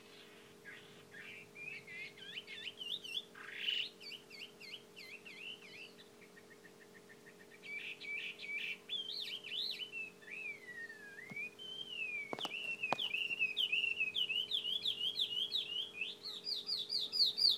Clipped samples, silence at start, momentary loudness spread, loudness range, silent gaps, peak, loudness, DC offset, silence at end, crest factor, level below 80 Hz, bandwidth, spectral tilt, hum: under 0.1%; 0 s; 21 LU; 13 LU; none; -18 dBFS; -39 LUFS; under 0.1%; 0 s; 24 dB; -90 dBFS; 19 kHz; -1 dB/octave; none